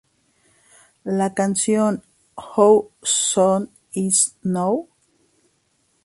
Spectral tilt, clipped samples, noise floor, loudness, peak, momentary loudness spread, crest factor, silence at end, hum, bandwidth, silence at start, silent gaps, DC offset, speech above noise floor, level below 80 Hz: -4 dB/octave; under 0.1%; -66 dBFS; -19 LUFS; -2 dBFS; 12 LU; 20 dB; 1.2 s; none; 11.5 kHz; 1.05 s; none; under 0.1%; 47 dB; -64 dBFS